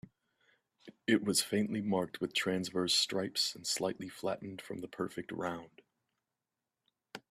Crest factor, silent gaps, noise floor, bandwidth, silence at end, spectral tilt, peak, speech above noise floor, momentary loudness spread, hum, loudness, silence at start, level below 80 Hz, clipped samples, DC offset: 22 dB; none; -90 dBFS; 15 kHz; 0.15 s; -3.5 dB/octave; -16 dBFS; 55 dB; 14 LU; none; -34 LUFS; 0.85 s; -76 dBFS; under 0.1%; under 0.1%